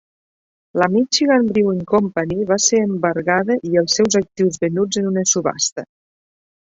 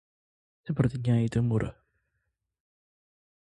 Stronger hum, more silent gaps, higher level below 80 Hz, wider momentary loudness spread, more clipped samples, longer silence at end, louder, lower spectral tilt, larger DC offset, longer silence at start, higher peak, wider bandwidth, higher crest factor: neither; first, 5.72-5.76 s vs none; about the same, -54 dBFS vs -52 dBFS; second, 6 LU vs 11 LU; neither; second, 0.8 s vs 1.7 s; first, -17 LUFS vs -28 LUFS; second, -3.5 dB/octave vs -8.5 dB/octave; neither; about the same, 0.75 s vs 0.65 s; first, -2 dBFS vs -10 dBFS; second, 8 kHz vs 9.8 kHz; about the same, 16 dB vs 20 dB